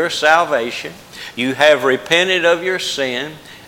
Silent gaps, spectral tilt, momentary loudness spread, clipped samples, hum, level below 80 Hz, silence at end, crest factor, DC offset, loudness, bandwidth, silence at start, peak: none; -3 dB/octave; 16 LU; under 0.1%; none; -58 dBFS; 0 s; 16 dB; under 0.1%; -15 LUFS; 17 kHz; 0 s; 0 dBFS